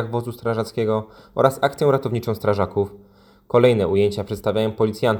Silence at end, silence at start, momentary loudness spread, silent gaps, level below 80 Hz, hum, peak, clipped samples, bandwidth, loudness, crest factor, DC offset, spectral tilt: 0 s; 0 s; 9 LU; none; -54 dBFS; none; 0 dBFS; under 0.1%; over 20 kHz; -21 LUFS; 20 dB; under 0.1%; -7 dB/octave